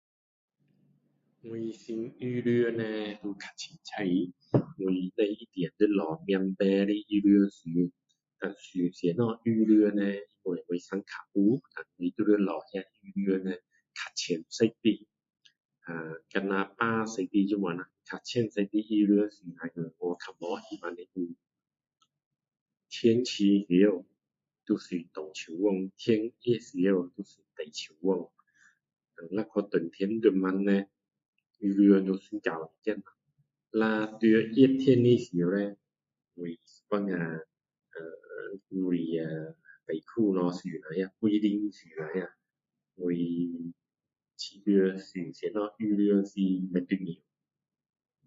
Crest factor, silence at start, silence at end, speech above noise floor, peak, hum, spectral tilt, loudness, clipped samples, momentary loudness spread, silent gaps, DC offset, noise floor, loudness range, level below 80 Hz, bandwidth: 22 dB; 1.45 s; 1.1 s; 60 dB; -8 dBFS; none; -7 dB/octave; -29 LUFS; under 0.1%; 16 LU; 15.65-15.69 s, 22.26-22.31 s, 22.61-22.66 s, 31.28-31.33 s; under 0.1%; -89 dBFS; 7 LU; -76 dBFS; 7.8 kHz